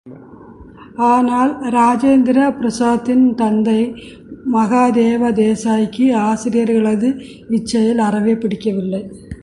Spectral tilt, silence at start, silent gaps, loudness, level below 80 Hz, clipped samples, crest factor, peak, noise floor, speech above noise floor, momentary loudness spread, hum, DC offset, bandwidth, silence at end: -6.5 dB/octave; 0.05 s; none; -15 LUFS; -48 dBFS; under 0.1%; 12 dB; -2 dBFS; -38 dBFS; 23 dB; 9 LU; none; under 0.1%; 11.5 kHz; 0.05 s